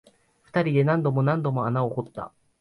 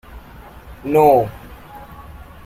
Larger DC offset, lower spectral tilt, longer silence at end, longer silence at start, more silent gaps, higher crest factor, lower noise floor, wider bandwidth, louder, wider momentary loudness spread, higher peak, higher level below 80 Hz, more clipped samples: neither; first, -9.5 dB/octave vs -7.5 dB/octave; about the same, 0.3 s vs 0.3 s; first, 0.55 s vs 0.15 s; neither; about the same, 14 dB vs 18 dB; first, -59 dBFS vs -39 dBFS; second, 5.6 kHz vs 16 kHz; second, -24 LUFS vs -15 LUFS; second, 15 LU vs 26 LU; second, -10 dBFS vs -2 dBFS; second, -62 dBFS vs -42 dBFS; neither